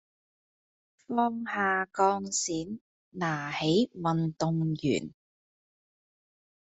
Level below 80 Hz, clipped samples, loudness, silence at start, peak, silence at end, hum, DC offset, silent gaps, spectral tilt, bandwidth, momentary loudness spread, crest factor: -66 dBFS; under 0.1%; -29 LUFS; 1.1 s; -12 dBFS; 1.6 s; none; under 0.1%; 2.81-3.12 s; -4.5 dB/octave; 8.2 kHz; 9 LU; 20 dB